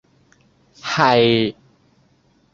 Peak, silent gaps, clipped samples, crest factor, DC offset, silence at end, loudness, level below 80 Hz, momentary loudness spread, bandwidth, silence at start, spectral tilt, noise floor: -2 dBFS; none; under 0.1%; 20 dB; under 0.1%; 1 s; -17 LUFS; -56 dBFS; 12 LU; 7.6 kHz; 0.85 s; -5.5 dB/octave; -59 dBFS